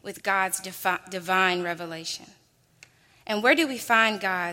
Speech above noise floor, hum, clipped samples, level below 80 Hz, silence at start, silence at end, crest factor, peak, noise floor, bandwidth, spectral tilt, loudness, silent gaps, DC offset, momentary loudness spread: 31 dB; none; under 0.1%; -72 dBFS; 0.05 s; 0 s; 22 dB; -6 dBFS; -57 dBFS; 16.5 kHz; -2.5 dB/octave; -25 LUFS; none; under 0.1%; 12 LU